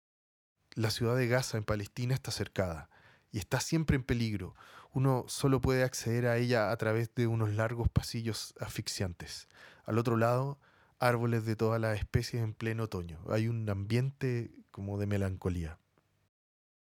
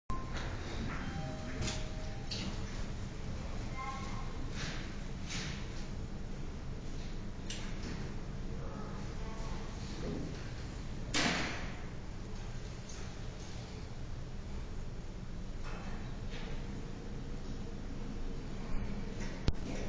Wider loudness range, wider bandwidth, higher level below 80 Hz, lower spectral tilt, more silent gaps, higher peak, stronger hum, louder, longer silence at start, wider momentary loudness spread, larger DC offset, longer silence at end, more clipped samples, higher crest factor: second, 4 LU vs 7 LU; first, 17.5 kHz vs 8 kHz; second, -52 dBFS vs -44 dBFS; first, -6 dB/octave vs -4.5 dB/octave; neither; first, -12 dBFS vs -18 dBFS; neither; first, -33 LUFS vs -42 LUFS; first, 0.75 s vs 0.1 s; first, 11 LU vs 7 LU; neither; first, 1.2 s vs 0 s; neither; about the same, 22 dB vs 20 dB